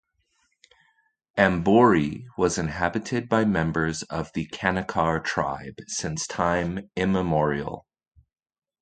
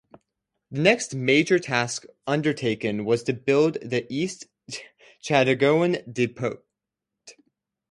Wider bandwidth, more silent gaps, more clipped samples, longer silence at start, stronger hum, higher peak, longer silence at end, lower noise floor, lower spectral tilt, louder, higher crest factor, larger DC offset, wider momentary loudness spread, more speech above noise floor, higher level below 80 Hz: second, 9.4 kHz vs 11.5 kHz; neither; neither; first, 1.35 s vs 0.7 s; neither; about the same, -2 dBFS vs -2 dBFS; first, 1 s vs 0.6 s; second, -71 dBFS vs -86 dBFS; about the same, -5.5 dB/octave vs -5 dB/octave; about the same, -24 LUFS vs -23 LUFS; about the same, 24 dB vs 22 dB; neither; second, 12 LU vs 17 LU; second, 46 dB vs 62 dB; first, -48 dBFS vs -66 dBFS